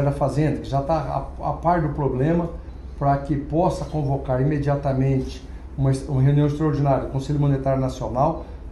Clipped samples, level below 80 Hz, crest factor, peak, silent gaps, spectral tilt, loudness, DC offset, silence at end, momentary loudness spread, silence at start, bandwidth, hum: under 0.1%; -36 dBFS; 14 dB; -6 dBFS; none; -8.5 dB/octave; -22 LUFS; under 0.1%; 0 s; 8 LU; 0 s; 10.5 kHz; none